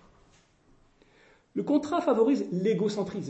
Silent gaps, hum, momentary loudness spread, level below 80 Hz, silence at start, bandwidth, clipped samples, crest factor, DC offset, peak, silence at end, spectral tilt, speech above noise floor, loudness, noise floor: none; none; 8 LU; -68 dBFS; 1.55 s; 8.4 kHz; under 0.1%; 16 dB; under 0.1%; -12 dBFS; 0 s; -7 dB/octave; 36 dB; -27 LUFS; -62 dBFS